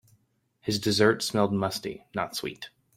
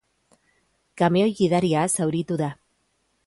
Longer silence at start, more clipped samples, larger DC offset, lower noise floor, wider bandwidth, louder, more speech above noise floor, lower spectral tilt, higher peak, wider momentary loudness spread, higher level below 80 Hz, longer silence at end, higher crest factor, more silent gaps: second, 0.65 s vs 0.95 s; neither; neither; about the same, -69 dBFS vs -70 dBFS; first, 16.5 kHz vs 12 kHz; second, -27 LUFS vs -22 LUFS; second, 42 dB vs 48 dB; about the same, -4.5 dB/octave vs -5.5 dB/octave; about the same, -8 dBFS vs -8 dBFS; first, 14 LU vs 7 LU; about the same, -62 dBFS vs -62 dBFS; second, 0.3 s vs 0.75 s; first, 22 dB vs 16 dB; neither